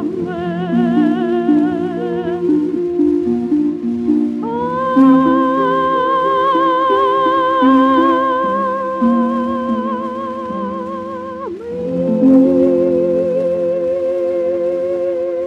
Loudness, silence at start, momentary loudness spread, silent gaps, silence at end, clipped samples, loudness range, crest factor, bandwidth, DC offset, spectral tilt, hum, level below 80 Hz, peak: -15 LUFS; 0 s; 11 LU; none; 0 s; under 0.1%; 5 LU; 14 dB; 6.6 kHz; under 0.1%; -8 dB/octave; none; -54 dBFS; 0 dBFS